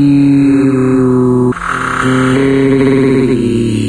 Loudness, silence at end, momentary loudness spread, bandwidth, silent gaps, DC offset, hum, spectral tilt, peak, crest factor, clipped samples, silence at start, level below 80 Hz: -10 LUFS; 0 s; 5 LU; 10.5 kHz; none; under 0.1%; none; -7.5 dB/octave; 0 dBFS; 10 dB; under 0.1%; 0 s; -34 dBFS